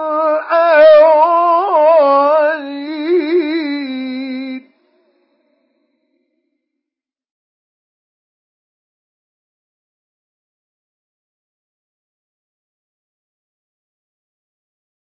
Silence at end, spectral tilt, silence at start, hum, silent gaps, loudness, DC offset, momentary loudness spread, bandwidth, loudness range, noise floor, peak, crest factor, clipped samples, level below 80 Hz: 10.6 s; -7.5 dB/octave; 0 s; none; none; -12 LUFS; under 0.1%; 16 LU; 5.8 kHz; 18 LU; -85 dBFS; 0 dBFS; 16 dB; under 0.1%; -74 dBFS